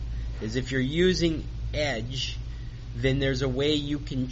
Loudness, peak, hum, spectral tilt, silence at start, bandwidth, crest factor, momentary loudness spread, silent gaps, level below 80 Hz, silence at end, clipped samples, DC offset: -28 LUFS; -12 dBFS; none; -5 dB/octave; 0 s; 8 kHz; 16 dB; 12 LU; none; -36 dBFS; 0 s; under 0.1%; under 0.1%